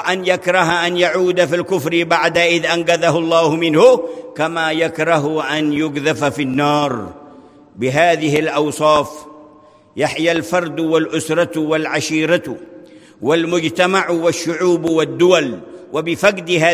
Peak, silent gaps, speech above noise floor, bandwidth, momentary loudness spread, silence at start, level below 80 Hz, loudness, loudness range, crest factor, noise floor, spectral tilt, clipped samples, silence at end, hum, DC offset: 0 dBFS; none; 30 dB; 16 kHz; 8 LU; 0 s; -56 dBFS; -16 LUFS; 4 LU; 16 dB; -45 dBFS; -4.5 dB/octave; under 0.1%; 0 s; none; under 0.1%